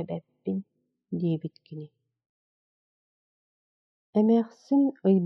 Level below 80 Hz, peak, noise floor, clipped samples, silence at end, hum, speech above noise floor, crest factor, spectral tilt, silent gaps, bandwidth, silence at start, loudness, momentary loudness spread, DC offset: -78 dBFS; -10 dBFS; under -90 dBFS; under 0.1%; 0 s; none; over 64 dB; 18 dB; -10.5 dB/octave; 2.26-4.13 s; 6.2 kHz; 0 s; -27 LUFS; 18 LU; under 0.1%